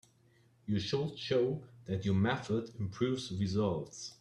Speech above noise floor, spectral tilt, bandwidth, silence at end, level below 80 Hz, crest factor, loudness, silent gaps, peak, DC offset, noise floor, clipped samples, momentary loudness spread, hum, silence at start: 33 dB; -6.5 dB/octave; 11 kHz; 0.05 s; -66 dBFS; 16 dB; -35 LUFS; none; -18 dBFS; under 0.1%; -67 dBFS; under 0.1%; 9 LU; none; 0.65 s